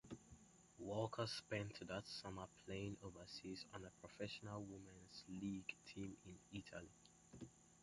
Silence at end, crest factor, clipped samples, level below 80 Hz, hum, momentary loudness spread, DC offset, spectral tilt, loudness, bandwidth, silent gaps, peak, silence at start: 0 s; 22 dB; under 0.1%; -72 dBFS; none; 14 LU; under 0.1%; -5 dB/octave; -52 LUFS; 11.5 kHz; none; -30 dBFS; 0.05 s